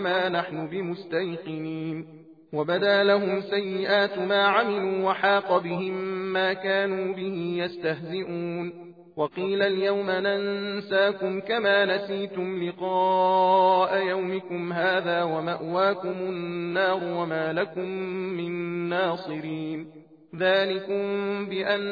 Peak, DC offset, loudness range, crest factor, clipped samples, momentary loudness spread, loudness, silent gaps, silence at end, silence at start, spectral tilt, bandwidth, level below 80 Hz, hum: -8 dBFS; under 0.1%; 5 LU; 18 dB; under 0.1%; 11 LU; -26 LUFS; none; 0 s; 0 s; -7.5 dB/octave; 5 kHz; -76 dBFS; none